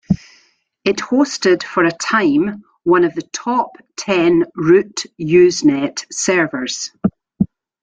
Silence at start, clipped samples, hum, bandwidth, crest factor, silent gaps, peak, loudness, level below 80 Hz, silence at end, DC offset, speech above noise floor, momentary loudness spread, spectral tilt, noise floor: 0.1 s; under 0.1%; none; 9.2 kHz; 16 dB; none; -2 dBFS; -16 LUFS; -52 dBFS; 0.4 s; under 0.1%; 41 dB; 10 LU; -4.5 dB/octave; -56 dBFS